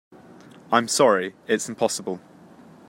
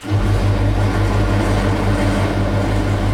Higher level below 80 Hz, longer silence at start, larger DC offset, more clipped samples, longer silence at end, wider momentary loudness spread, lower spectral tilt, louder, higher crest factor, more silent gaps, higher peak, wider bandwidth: second, -72 dBFS vs -22 dBFS; first, 0.7 s vs 0 s; neither; neither; first, 0.7 s vs 0 s; first, 12 LU vs 1 LU; second, -3 dB/octave vs -7 dB/octave; second, -22 LUFS vs -17 LUFS; first, 22 dB vs 12 dB; neither; about the same, -2 dBFS vs -4 dBFS; first, 16 kHz vs 12.5 kHz